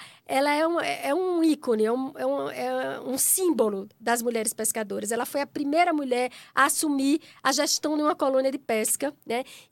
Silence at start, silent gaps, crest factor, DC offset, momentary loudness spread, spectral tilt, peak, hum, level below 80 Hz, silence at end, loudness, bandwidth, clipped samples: 0 s; none; 20 dB; under 0.1%; 7 LU; -2 dB/octave; -6 dBFS; none; -78 dBFS; 0.1 s; -25 LUFS; 17.5 kHz; under 0.1%